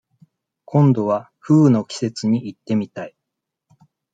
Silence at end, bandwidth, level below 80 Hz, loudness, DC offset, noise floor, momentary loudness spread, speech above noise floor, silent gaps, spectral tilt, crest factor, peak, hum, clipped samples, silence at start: 1.05 s; 9.2 kHz; -66 dBFS; -19 LUFS; under 0.1%; -81 dBFS; 13 LU; 63 dB; none; -8 dB/octave; 16 dB; -4 dBFS; none; under 0.1%; 0.7 s